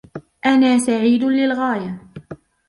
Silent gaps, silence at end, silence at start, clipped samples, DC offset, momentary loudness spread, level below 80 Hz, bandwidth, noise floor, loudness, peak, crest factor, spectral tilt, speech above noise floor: none; 0.35 s; 0.15 s; under 0.1%; under 0.1%; 22 LU; -58 dBFS; 11.5 kHz; -39 dBFS; -17 LUFS; -4 dBFS; 14 dB; -4.5 dB/octave; 23 dB